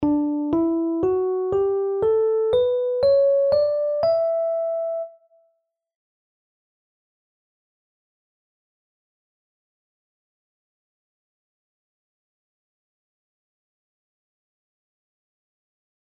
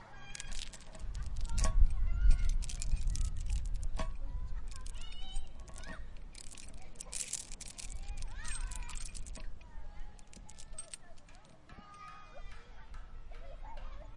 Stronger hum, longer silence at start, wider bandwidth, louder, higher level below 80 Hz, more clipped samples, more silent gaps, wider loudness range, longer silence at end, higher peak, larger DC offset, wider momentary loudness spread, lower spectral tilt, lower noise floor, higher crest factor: neither; about the same, 0 s vs 0 s; second, 5.2 kHz vs 11.5 kHz; first, -21 LUFS vs -42 LUFS; second, -60 dBFS vs -36 dBFS; neither; neither; second, 11 LU vs 15 LU; first, 10.95 s vs 0 s; about the same, -10 dBFS vs -12 dBFS; neither; second, 7 LU vs 19 LU; first, -9 dB/octave vs -3.5 dB/octave; first, -71 dBFS vs -54 dBFS; second, 16 dB vs 22 dB